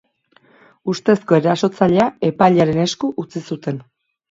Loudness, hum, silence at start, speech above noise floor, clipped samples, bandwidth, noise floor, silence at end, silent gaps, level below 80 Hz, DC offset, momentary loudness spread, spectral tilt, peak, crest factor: -17 LUFS; none; 0.85 s; 39 dB; under 0.1%; 7.8 kHz; -56 dBFS; 0.5 s; none; -54 dBFS; under 0.1%; 13 LU; -6.5 dB/octave; 0 dBFS; 18 dB